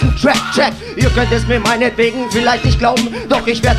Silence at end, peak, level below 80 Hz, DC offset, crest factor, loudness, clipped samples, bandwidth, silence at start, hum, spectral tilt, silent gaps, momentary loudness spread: 0 s; 0 dBFS; -22 dBFS; under 0.1%; 14 dB; -14 LUFS; under 0.1%; 15.5 kHz; 0 s; none; -5 dB/octave; none; 3 LU